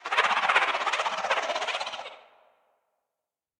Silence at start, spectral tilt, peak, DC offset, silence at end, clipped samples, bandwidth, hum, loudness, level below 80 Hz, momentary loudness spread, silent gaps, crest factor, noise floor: 0 s; 0.5 dB/octave; -8 dBFS; under 0.1%; 1.4 s; under 0.1%; 17.5 kHz; none; -26 LUFS; -76 dBFS; 13 LU; none; 20 dB; -88 dBFS